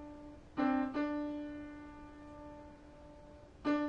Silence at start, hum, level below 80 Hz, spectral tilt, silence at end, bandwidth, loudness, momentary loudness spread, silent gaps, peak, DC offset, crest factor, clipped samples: 0 s; none; -62 dBFS; -7 dB/octave; 0 s; 7.2 kHz; -38 LUFS; 22 LU; none; -22 dBFS; under 0.1%; 18 dB; under 0.1%